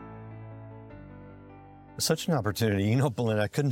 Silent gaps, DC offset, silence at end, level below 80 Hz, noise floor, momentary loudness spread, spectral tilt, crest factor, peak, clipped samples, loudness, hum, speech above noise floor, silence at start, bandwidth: none; under 0.1%; 0 s; -60 dBFS; -49 dBFS; 22 LU; -5.5 dB/octave; 18 dB; -12 dBFS; under 0.1%; -27 LUFS; none; 23 dB; 0 s; 16.5 kHz